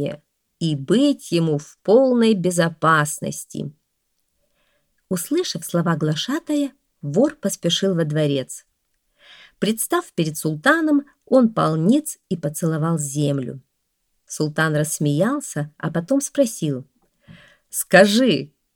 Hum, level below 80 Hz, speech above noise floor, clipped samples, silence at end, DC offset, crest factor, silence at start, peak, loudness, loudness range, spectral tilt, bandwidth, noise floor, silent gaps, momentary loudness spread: none; -66 dBFS; 52 dB; under 0.1%; 0.3 s; under 0.1%; 20 dB; 0 s; 0 dBFS; -20 LUFS; 5 LU; -5 dB/octave; 19 kHz; -72 dBFS; none; 12 LU